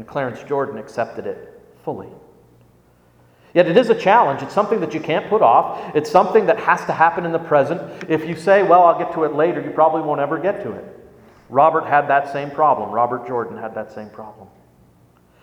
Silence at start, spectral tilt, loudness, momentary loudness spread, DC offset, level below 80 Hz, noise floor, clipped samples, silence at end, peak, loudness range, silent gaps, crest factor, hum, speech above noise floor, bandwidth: 0 s; -6.5 dB/octave; -17 LUFS; 16 LU; under 0.1%; -62 dBFS; -54 dBFS; under 0.1%; 1 s; 0 dBFS; 6 LU; none; 18 dB; none; 36 dB; 11.5 kHz